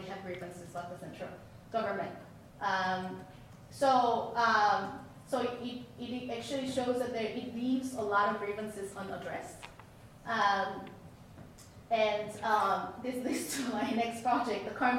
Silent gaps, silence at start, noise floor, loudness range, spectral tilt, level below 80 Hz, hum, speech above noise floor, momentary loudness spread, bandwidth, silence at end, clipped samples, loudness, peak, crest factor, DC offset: none; 0 s; -54 dBFS; 6 LU; -4 dB/octave; -66 dBFS; none; 21 dB; 21 LU; 16 kHz; 0 s; under 0.1%; -33 LUFS; -16 dBFS; 18 dB; under 0.1%